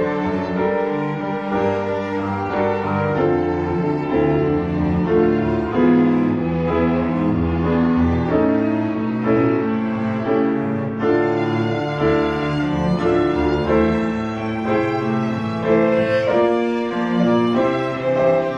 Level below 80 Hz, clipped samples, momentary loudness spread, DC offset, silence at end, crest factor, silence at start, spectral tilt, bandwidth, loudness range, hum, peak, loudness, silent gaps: -38 dBFS; under 0.1%; 5 LU; under 0.1%; 0 s; 14 dB; 0 s; -8.5 dB/octave; 7.6 kHz; 2 LU; none; -4 dBFS; -19 LUFS; none